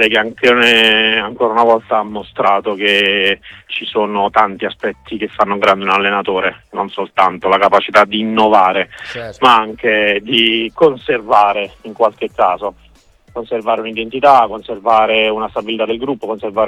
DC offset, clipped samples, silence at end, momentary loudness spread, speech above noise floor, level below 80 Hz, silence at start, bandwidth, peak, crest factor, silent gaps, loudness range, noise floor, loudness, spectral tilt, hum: under 0.1%; 0.1%; 0 s; 12 LU; 33 dB; -50 dBFS; 0 s; 15 kHz; 0 dBFS; 14 dB; none; 4 LU; -47 dBFS; -13 LUFS; -4.5 dB/octave; none